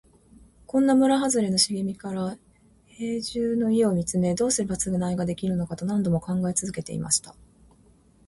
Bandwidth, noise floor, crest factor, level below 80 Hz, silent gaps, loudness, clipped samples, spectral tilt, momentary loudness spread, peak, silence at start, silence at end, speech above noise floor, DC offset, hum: 11.5 kHz; -57 dBFS; 18 dB; -54 dBFS; none; -25 LUFS; under 0.1%; -4.5 dB/octave; 10 LU; -8 dBFS; 0.75 s; 0.95 s; 33 dB; under 0.1%; none